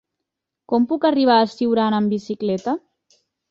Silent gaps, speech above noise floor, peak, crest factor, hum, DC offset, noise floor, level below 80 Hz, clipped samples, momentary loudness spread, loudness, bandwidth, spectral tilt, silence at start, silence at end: none; 64 dB; -4 dBFS; 18 dB; none; under 0.1%; -82 dBFS; -64 dBFS; under 0.1%; 8 LU; -19 LUFS; 7.4 kHz; -6.5 dB/octave; 0.7 s; 0.7 s